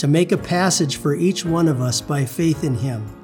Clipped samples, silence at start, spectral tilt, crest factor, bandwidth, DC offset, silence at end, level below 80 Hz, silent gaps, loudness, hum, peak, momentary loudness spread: under 0.1%; 0 s; -5 dB/octave; 16 dB; over 20 kHz; under 0.1%; 0 s; -48 dBFS; none; -19 LUFS; none; -4 dBFS; 5 LU